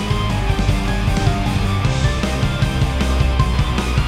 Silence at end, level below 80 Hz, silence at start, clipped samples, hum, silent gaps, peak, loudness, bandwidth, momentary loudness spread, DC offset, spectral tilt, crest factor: 0 s; -20 dBFS; 0 s; under 0.1%; none; none; 0 dBFS; -19 LUFS; 14.5 kHz; 2 LU; under 0.1%; -6 dB/octave; 16 dB